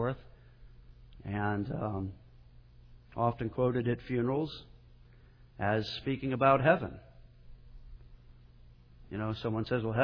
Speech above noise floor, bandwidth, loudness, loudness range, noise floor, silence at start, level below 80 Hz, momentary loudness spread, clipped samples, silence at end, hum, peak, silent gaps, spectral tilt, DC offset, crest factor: 26 dB; 5.4 kHz; -32 LUFS; 6 LU; -57 dBFS; 0 s; -54 dBFS; 17 LU; under 0.1%; 0 s; 60 Hz at -55 dBFS; -12 dBFS; none; -5.5 dB/octave; under 0.1%; 22 dB